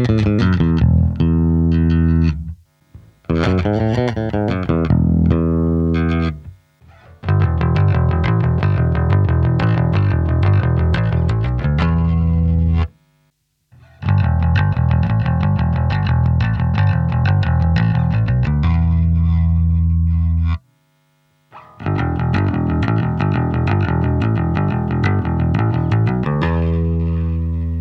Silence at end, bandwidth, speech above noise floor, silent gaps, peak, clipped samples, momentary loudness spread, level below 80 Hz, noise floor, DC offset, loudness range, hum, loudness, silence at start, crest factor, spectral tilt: 0 s; 6 kHz; 48 dB; none; -2 dBFS; under 0.1%; 4 LU; -24 dBFS; -64 dBFS; under 0.1%; 3 LU; none; -17 LUFS; 0 s; 14 dB; -9.5 dB/octave